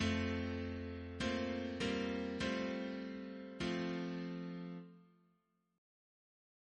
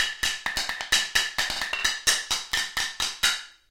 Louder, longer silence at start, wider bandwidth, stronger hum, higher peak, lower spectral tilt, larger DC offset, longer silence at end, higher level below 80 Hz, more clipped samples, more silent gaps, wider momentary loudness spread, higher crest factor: second, -41 LUFS vs -25 LUFS; about the same, 0 s vs 0 s; second, 9.6 kHz vs 17 kHz; neither; second, -24 dBFS vs -6 dBFS; first, -5.5 dB/octave vs 1.5 dB/octave; neither; first, 1.75 s vs 0.2 s; second, -60 dBFS vs -50 dBFS; neither; neither; first, 9 LU vs 6 LU; about the same, 18 dB vs 22 dB